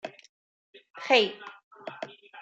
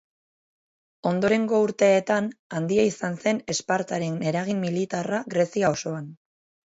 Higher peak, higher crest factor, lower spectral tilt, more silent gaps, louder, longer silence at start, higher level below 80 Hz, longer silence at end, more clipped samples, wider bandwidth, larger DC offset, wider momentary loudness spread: about the same, -8 dBFS vs -8 dBFS; about the same, 22 dB vs 18 dB; second, -2.5 dB/octave vs -5.5 dB/octave; first, 0.29-0.73 s, 0.90-0.94 s, 1.64-1.71 s vs 2.39-2.50 s; about the same, -24 LUFS vs -24 LUFS; second, 0.05 s vs 1.05 s; second, -86 dBFS vs -64 dBFS; second, 0 s vs 0.55 s; neither; first, 9 kHz vs 8 kHz; neither; first, 22 LU vs 10 LU